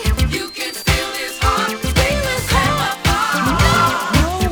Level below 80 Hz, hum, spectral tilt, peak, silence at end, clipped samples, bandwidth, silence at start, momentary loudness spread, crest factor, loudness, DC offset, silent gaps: -24 dBFS; none; -4 dB/octave; 0 dBFS; 0 s; under 0.1%; over 20 kHz; 0 s; 6 LU; 16 dB; -17 LUFS; under 0.1%; none